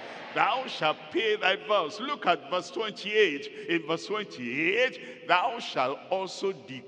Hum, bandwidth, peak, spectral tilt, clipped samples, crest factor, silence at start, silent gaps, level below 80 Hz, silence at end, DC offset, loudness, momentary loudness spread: none; 9.8 kHz; -6 dBFS; -3.5 dB/octave; under 0.1%; 22 dB; 0 s; none; -88 dBFS; 0 s; under 0.1%; -28 LUFS; 8 LU